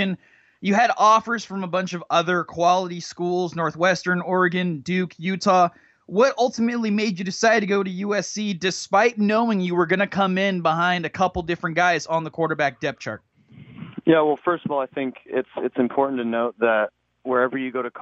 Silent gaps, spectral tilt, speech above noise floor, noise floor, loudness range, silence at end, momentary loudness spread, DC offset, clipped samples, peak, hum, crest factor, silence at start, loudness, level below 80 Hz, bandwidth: none; -5 dB/octave; 25 dB; -46 dBFS; 3 LU; 0 s; 9 LU; under 0.1%; under 0.1%; -4 dBFS; none; 18 dB; 0 s; -22 LUFS; -56 dBFS; 8.2 kHz